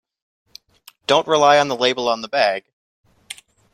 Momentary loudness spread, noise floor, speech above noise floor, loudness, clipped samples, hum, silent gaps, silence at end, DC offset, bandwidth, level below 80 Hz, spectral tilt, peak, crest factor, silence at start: 23 LU; -51 dBFS; 34 dB; -17 LUFS; under 0.1%; none; 2.73-3.04 s; 0.4 s; under 0.1%; 14 kHz; -66 dBFS; -3 dB/octave; -2 dBFS; 18 dB; 1.1 s